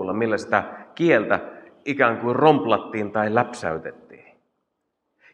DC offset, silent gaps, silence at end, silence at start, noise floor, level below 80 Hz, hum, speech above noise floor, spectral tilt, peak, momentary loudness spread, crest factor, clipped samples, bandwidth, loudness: under 0.1%; none; 1.2 s; 0 s; -77 dBFS; -68 dBFS; none; 55 dB; -6.5 dB/octave; -2 dBFS; 15 LU; 20 dB; under 0.1%; 10 kHz; -21 LUFS